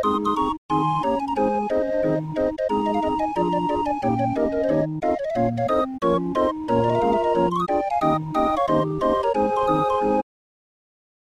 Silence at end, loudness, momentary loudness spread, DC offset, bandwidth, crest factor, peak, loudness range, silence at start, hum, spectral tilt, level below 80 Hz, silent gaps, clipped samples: 1.05 s; -22 LUFS; 3 LU; under 0.1%; 12 kHz; 16 dB; -6 dBFS; 2 LU; 0 s; none; -7.5 dB/octave; -46 dBFS; 0.58-0.69 s; under 0.1%